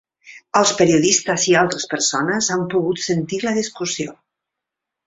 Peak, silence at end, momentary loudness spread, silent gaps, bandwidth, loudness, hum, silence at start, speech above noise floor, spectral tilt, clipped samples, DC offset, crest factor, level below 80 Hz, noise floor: -2 dBFS; 0.95 s; 9 LU; none; 8 kHz; -18 LUFS; none; 0.25 s; 65 dB; -3 dB/octave; under 0.1%; under 0.1%; 18 dB; -58 dBFS; -83 dBFS